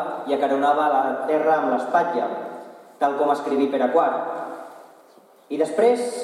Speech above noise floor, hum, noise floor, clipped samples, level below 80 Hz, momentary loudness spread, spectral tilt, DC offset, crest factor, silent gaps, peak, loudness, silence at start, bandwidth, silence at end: 31 dB; none; -52 dBFS; under 0.1%; -88 dBFS; 13 LU; -5 dB/octave; under 0.1%; 16 dB; none; -6 dBFS; -21 LUFS; 0 s; 13 kHz; 0 s